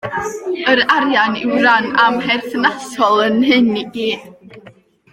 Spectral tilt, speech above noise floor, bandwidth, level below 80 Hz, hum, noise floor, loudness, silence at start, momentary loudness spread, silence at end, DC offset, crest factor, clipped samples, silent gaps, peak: -4 dB/octave; 30 dB; 16 kHz; -56 dBFS; none; -45 dBFS; -14 LUFS; 0.05 s; 9 LU; 0.4 s; under 0.1%; 16 dB; under 0.1%; none; 0 dBFS